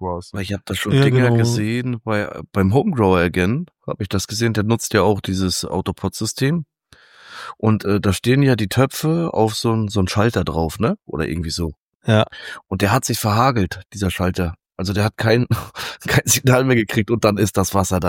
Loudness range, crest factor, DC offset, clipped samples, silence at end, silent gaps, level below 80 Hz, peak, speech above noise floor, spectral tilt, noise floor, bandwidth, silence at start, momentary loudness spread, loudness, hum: 3 LU; 16 dB; under 0.1%; under 0.1%; 0 s; 11.79-11.88 s, 11.95-12.00 s; -42 dBFS; -2 dBFS; 32 dB; -5.5 dB/octave; -50 dBFS; 17 kHz; 0 s; 11 LU; -19 LUFS; none